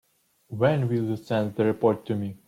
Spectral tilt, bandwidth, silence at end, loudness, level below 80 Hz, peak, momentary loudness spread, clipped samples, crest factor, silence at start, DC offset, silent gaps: -8.5 dB/octave; 15 kHz; 0.1 s; -25 LUFS; -64 dBFS; -8 dBFS; 6 LU; under 0.1%; 18 dB; 0.5 s; under 0.1%; none